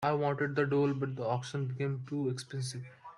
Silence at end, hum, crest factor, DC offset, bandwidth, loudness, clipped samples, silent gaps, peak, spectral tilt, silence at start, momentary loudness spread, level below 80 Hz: 0 s; none; 18 dB; under 0.1%; 11 kHz; -34 LUFS; under 0.1%; none; -16 dBFS; -6.5 dB/octave; 0 s; 9 LU; -72 dBFS